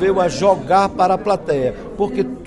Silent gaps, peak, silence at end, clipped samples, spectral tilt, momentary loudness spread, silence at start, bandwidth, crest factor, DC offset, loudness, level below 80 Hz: none; -2 dBFS; 0 s; under 0.1%; -6 dB/octave; 7 LU; 0 s; 11.5 kHz; 16 dB; under 0.1%; -17 LUFS; -42 dBFS